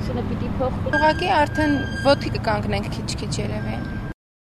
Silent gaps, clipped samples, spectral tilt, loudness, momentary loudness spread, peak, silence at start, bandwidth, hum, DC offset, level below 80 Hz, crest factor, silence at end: none; under 0.1%; -6 dB/octave; -22 LUFS; 9 LU; -4 dBFS; 0 s; 13.5 kHz; none; under 0.1%; -34 dBFS; 18 dB; 0.35 s